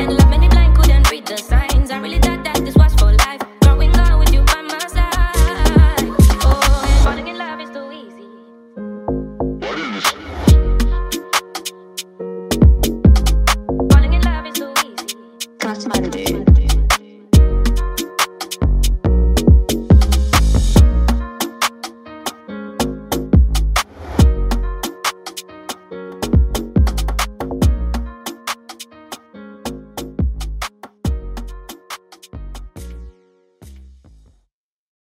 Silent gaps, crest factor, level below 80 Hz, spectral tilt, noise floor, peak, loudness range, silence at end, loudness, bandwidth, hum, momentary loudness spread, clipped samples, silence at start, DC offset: none; 14 dB; -16 dBFS; -5.5 dB/octave; -54 dBFS; 0 dBFS; 13 LU; 1.35 s; -16 LUFS; 16 kHz; none; 18 LU; under 0.1%; 0 s; under 0.1%